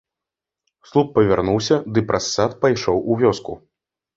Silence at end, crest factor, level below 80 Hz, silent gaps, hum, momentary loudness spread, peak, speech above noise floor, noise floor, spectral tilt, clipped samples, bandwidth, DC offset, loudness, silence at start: 0.6 s; 18 dB; -48 dBFS; none; none; 6 LU; -2 dBFS; 68 dB; -86 dBFS; -5.5 dB/octave; under 0.1%; 7.8 kHz; under 0.1%; -19 LUFS; 0.95 s